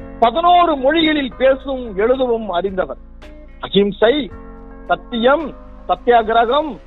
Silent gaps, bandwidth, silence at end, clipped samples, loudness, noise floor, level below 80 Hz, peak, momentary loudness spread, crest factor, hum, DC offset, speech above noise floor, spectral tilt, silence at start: none; 4.2 kHz; 0.05 s; under 0.1%; -16 LUFS; -36 dBFS; -38 dBFS; 0 dBFS; 14 LU; 16 dB; none; under 0.1%; 21 dB; -8 dB/octave; 0 s